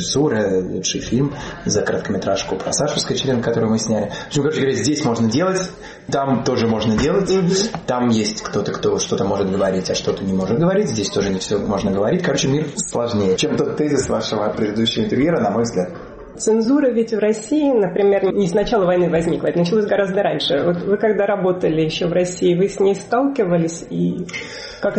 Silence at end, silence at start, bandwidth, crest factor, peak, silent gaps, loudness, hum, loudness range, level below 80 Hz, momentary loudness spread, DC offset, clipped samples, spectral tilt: 0 s; 0 s; 8.8 kHz; 12 dB; -6 dBFS; none; -19 LUFS; none; 2 LU; -44 dBFS; 5 LU; under 0.1%; under 0.1%; -5 dB/octave